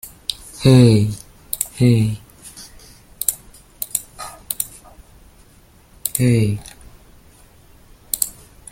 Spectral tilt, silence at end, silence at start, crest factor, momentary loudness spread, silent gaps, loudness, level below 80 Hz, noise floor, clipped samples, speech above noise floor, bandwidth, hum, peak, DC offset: -5.5 dB/octave; 0.4 s; 0.05 s; 20 dB; 22 LU; none; -18 LUFS; -44 dBFS; -49 dBFS; under 0.1%; 36 dB; 16.5 kHz; none; 0 dBFS; under 0.1%